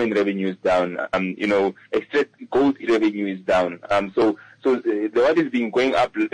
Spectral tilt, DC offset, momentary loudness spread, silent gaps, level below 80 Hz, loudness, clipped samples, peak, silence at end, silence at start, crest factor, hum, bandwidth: -6 dB/octave; under 0.1%; 5 LU; none; -56 dBFS; -21 LUFS; under 0.1%; -10 dBFS; 0.05 s; 0 s; 10 dB; none; 10 kHz